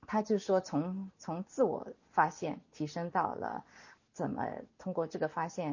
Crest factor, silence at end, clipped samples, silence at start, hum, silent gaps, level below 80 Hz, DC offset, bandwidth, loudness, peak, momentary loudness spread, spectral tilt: 22 dB; 0 s; under 0.1%; 0.1 s; none; none; -72 dBFS; under 0.1%; 7.4 kHz; -35 LUFS; -12 dBFS; 10 LU; -6.5 dB/octave